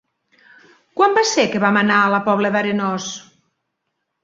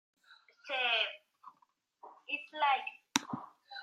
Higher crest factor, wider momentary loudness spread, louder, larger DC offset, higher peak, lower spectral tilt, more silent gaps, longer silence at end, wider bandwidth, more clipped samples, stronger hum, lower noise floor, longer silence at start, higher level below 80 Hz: second, 18 dB vs 32 dB; second, 13 LU vs 20 LU; first, -17 LUFS vs -34 LUFS; neither; first, -2 dBFS vs -6 dBFS; first, -4 dB/octave vs -1 dB/octave; neither; first, 1.05 s vs 0 s; second, 7.8 kHz vs 13.5 kHz; neither; neither; about the same, -75 dBFS vs -73 dBFS; first, 0.95 s vs 0.3 s; first, -64 dBFS vs -88 dBFS